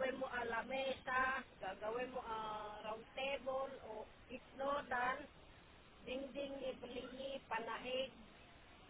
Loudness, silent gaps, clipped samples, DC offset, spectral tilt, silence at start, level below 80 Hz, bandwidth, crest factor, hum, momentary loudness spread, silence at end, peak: -44 LUFS; none; under 0.1%; under 0.1%; -1.5 dB/octave; 0 s; -68 dBFS; 4 kHz; 20 dB; none; 18 LU; 0 s; -26 dBFS